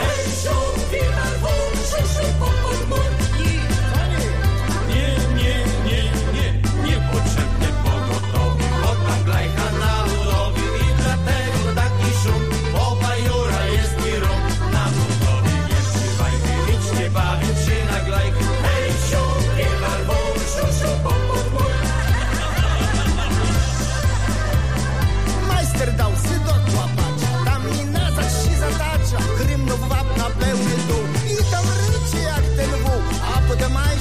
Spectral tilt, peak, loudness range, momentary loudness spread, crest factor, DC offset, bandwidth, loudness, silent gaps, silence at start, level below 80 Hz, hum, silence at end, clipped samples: -5 dB/octave; -6 dBFS; 1 LU; 2 LU; 12 dB; 2%; 15.5 kHz; -20 LUFS; none; 0 s; -22 dBFS; none; 0 s; under 0.1%